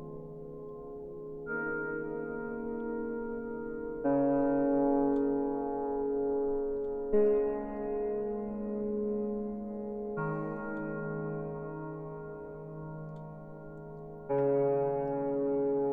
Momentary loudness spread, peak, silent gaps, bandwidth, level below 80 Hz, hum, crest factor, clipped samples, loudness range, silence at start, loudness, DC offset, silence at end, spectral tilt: 16 LU; -16 dBFS; none; 2.9 kHz; -56 dBFS; none; 16 dB; under 0.1%; 8 LU; 0 s; -33 LUFS; under 0.1%; 0 s; -12 dB/octave